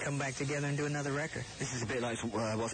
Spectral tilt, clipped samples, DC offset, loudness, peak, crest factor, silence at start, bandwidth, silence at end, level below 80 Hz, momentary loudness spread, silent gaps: -4.5 dB/octave; under 0.1%; under 0.1%; -36 LUFS; -24 dBFS; 12 dB; 0 s; 9.4 kHz; 0 s; -62 dBFS; 4 LU; none